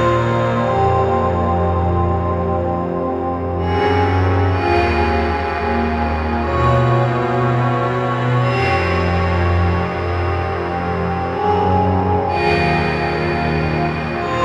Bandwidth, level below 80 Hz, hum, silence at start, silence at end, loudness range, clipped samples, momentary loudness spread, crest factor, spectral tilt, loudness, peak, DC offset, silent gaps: 7.6 kHz; -30 dBFS; none; 0 s; 0 s; 1 LU; under 0.1%; 5 LU; 14 dB; -8 dB/octave; -17 LUFS; -2 dBFS; under 0.1%; none